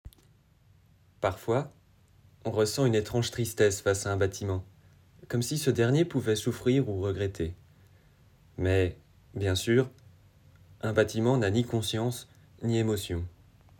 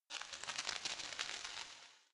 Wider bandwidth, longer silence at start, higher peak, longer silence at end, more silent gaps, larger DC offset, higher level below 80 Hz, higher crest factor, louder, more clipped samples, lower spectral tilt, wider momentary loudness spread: first, 18 kHz vs 11.5 kHz; about the same, 0.05 s vs 0.1 s; first, -10 dBFS vs -20 dBFS; first, 0.5 s vs 0.1 s; neither; neither; first, -54 dBFS vs -78 dBFS; second, 18 dB vs 26 dB; first, -29 LUFS vs -44 LUFS; neither; first, -5.5 dB/octave vs 1 dB/octave; about the same, 11 LU vs 9 LU